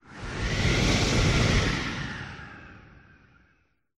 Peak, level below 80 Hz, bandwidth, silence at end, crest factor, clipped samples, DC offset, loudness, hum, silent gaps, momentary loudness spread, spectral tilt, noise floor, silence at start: -10 dBFS; -34 dBFS; 13 kHz; 1.15 s; 18 dB; under 0.1%; under 0.1%; -25 LUFS; none; none; 18 LU; -4.5 dB/octave; -68 dBFS; 0.1 s